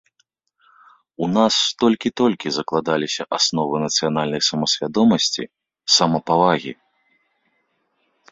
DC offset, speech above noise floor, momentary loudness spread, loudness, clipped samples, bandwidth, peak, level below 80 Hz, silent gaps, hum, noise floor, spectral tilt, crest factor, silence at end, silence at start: under 0.1%; 49 dB; 8 LU; -19 LUFS; under 0.1%; 7.8 kHz; -2 dBFS; -60 dBFS; none; none; -68 dBFS; -3.5 dB/octave; 20 dB; 1.6 s; 1.2 s